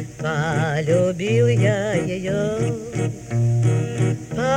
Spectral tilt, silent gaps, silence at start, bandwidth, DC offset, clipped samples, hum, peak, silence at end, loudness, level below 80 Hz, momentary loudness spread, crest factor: -6.5 dB/octave; none; 0 s; 10 kHz; under 0.1%; under 0.1%; none; -8 dBFS; 0 s; -21 LUFS; -48 dBFS; 7 LU; 12 dB